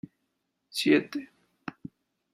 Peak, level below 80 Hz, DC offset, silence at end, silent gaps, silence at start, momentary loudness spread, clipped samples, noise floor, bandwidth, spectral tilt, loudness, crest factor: -10 dBFS; -74 dBFS; under 0.1%; 0.65 s; none; 0.75 s; 24 LU; under 0.1%; -79 dBFS; 14.5 kHz; -4.5 dB/octave; -27 LUFS; 22 dB